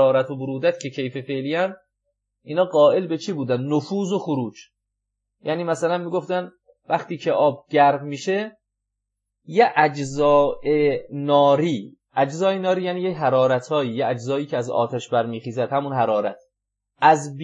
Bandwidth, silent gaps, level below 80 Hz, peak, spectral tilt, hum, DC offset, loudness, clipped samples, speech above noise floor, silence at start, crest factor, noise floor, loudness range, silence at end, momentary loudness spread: 9.4 kHz; none; -60 dBFS; -2 dBFS; -6 dB/octave; 50 Hz at -60 dBFS; under 0.1%; -21 LUFS; under 0.1%; 60 dB; 0 s; 18 dB; -81 dBFS; 5 LU; 0 s; 10 LU